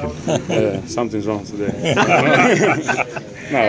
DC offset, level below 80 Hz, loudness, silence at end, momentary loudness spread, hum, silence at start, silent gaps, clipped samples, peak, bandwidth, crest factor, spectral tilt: under 0.1%; -44 dBFS; -17 LUFS; 0 s; 11 LU; none; 0 s; none; under 0.1%; 0 dBFS; 8 kHz; 18 dB; -5 dB/octave